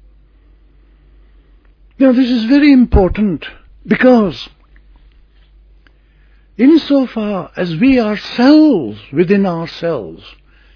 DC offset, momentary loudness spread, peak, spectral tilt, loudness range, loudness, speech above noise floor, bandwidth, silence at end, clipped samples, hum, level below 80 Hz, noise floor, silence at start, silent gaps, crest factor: under 0.1%; 13 LU; 0 dBFS; -8 dB/octave; 5 LU; -12 LUFS; 36 dB; 5.4 kHz; 0.45 s; under 0.1%; none; -30 dBFS; -47 dBFS; 2 s; none; 14 dB